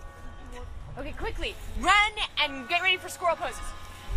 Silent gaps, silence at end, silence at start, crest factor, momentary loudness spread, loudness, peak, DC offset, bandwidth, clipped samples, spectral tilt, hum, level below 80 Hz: none; 0 s; 0 s; 22 dB; 22 LU; -26 LUFS; -8 dBFS; under 0.1%; 15.5 kHz; under 0.1%; -2.5 dB/octave; none; -40 dBFS